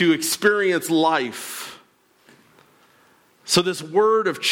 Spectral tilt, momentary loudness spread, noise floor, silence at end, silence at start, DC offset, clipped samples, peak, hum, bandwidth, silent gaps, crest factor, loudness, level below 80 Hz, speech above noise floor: -3.5 dB/octave; 14 LU; -57 dBFS; 0 s; 0 s; under 0.1%; under 0.1%; -6 dBFS; none; 18 kHz; none; 16 dB; -20 LUFS; -64 dBFS; 37 dB